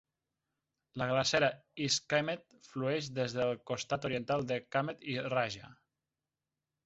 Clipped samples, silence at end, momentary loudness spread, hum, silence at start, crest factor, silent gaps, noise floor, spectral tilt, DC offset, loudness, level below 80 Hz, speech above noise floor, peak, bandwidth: under 0.1%; 1.15 s; 9 LU; none; 0.95 s; 22 dB; none; under -90 dBFS; -3 dB/octave; under 0.1%; -34 LUFS; -70 dBFS; over 56 dB; -14 dBFS; 8 kHz